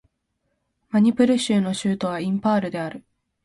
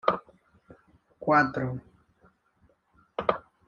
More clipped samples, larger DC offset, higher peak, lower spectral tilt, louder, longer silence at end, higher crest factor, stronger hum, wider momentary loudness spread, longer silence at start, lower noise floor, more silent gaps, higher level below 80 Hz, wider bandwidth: neither; neither; about the same, -6 dBFS vs -6 dBFS; second, -6 dB/octave vs -7.5 dB/octave; first, -22 LUFS vs -28 LUFS; first, 0.45 s vs 0.25 s; second, 18 dB vs 26 dB; neither; second, 10 LU vs 15 LU; first, 0.95 s vs 0.05 s; first, -74 dBFS vs -67 dBFS; neither; about the same, -62 dBFS vs -62 dBFS; first, 11.5 kHz vs 7.2 kHz